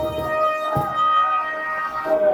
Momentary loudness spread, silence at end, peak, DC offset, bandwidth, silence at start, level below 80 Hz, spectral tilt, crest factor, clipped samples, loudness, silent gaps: 6 LU; 0 s; -8 dBFS; under 0.1%; 19.5 kHz; 0 s; -48 dBFS; -5.5 dB/octave; 12 dB; under 0.1%; -21 LUFS; none